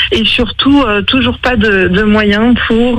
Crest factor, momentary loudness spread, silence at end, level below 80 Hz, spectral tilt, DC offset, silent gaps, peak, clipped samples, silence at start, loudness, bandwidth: 10 dB; 2 LU; 0 s; -26 dBFS; -6 dB/octave; under 0.1%; none; 0 dBFS; under 0.1%; 0 s; -9 LUFS; 10.5 kHz